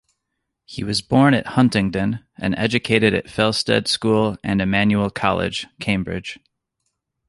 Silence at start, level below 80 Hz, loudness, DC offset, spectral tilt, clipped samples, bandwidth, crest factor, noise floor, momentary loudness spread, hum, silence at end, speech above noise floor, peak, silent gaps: 0.7 s; -46 dBFS; -19 LUFS; under 0.1%; -5.5 dB/octave; under 0.1%; 11.5 kHz; 18 dB; -78 dBFS; 10 LU; none; 0.95 s; 59 dB; -2 dBFS; none